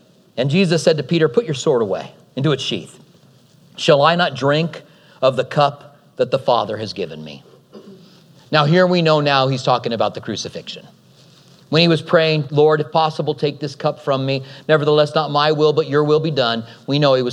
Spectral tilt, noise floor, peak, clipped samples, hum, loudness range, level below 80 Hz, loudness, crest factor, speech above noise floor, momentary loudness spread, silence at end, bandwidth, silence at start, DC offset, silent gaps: -6 dB/octave; -50 dBFS; 0 dBFS; under 0.1%; none; 3 LU; -68 dBFS; -17 LUFS; 18 dB; 33 dB; 12 LU; 0 s; 11 kHz; 0.35 s; under 0.1%; none